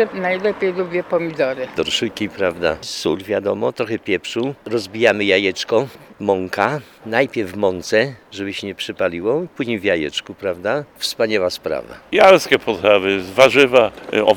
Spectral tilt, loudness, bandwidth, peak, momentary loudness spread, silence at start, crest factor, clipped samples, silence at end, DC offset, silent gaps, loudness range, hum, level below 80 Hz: -4 dB/octave; -18 LUFS; 19 kHz; 0 dBFS; 11 LU; 0 s; 18 dB; under 0.1%; 0 s; under 0.1%; none; 6 LU; none; -54 dBFS